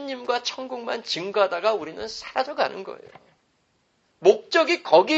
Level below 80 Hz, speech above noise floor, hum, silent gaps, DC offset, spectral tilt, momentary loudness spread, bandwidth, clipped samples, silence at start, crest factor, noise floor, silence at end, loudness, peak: -68 dBFS; 45 dB; none; none; under 0.1%; -3 dB/octave; 14 LU; 8.2 kHz; under 0.1%; 0 s; 22 dB; -68 dBFS; 0 s; -24 LUFS; -2 dBFS